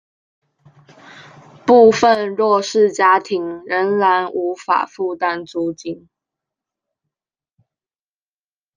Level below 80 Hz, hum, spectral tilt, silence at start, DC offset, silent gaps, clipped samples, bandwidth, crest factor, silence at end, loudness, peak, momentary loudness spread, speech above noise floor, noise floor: -66 dBFS; none; -4.5 dB/octave; 1.15 s; under 0.1%; none; under 0.1%; 9.6 kHz; 18 dB; 2.8 s; -16 LUFS; 0 dBFS; 13 LU; over 74 dB; under -90 dBFS